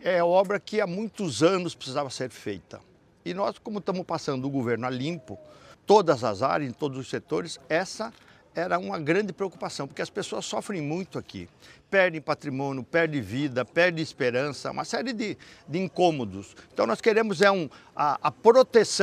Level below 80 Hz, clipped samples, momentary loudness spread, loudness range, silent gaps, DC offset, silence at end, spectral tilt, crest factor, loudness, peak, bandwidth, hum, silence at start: -68 dBFS; under 0.1%; 15 LU; 5 LU; none; under 0.1%; 0 s; -5 dB/octave; 24 dB; -26 LUFS; -4 dBFS; 13.5 kHz; none; 0 s